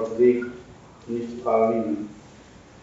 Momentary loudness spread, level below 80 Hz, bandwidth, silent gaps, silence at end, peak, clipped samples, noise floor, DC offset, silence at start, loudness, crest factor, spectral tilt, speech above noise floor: 19 LU; -58 dBFS; 7.8 kHz; none; 0.55 s; -8 dBFS; under 0.1%; -48 dBFS; under 0.1%; 0 s; -24 LUFS; 18 dB; -7 dB/octave; 25 dB